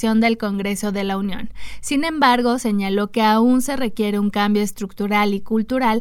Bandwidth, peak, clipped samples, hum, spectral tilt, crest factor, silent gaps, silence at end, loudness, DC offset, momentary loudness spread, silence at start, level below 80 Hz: 16.5 kHz; -2 dBFS; under 0.1%; none; -5 dB/octave; 18 dB; none; 0 s; -19 LUFS; under 0.1%; 9 LU; 0 s; -46 dBFS